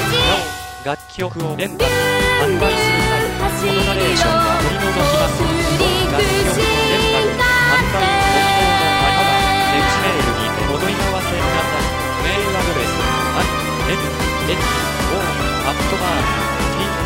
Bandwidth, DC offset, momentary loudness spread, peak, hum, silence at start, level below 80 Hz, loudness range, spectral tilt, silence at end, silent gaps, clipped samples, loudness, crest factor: 16.5 kHz; under 0.1%; 5 LU; -2 dBFS; none; 0 s; -28 dBFS; 4 LU; -4 dB/octave; 0 s; none; under 0.1%; -16 LUFS; 14 dB